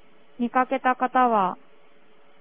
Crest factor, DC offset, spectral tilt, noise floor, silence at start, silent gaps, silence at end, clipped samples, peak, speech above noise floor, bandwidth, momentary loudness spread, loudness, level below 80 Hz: 20 dB; 0.4%; -9 dB/octave; -58 dBFS; 0.4 s; none; 0.85 s; under 0.1%; -6 dBFS; 36 dB; 3.7 kHz; 10 LU; -23 LUFS; -70 dBFS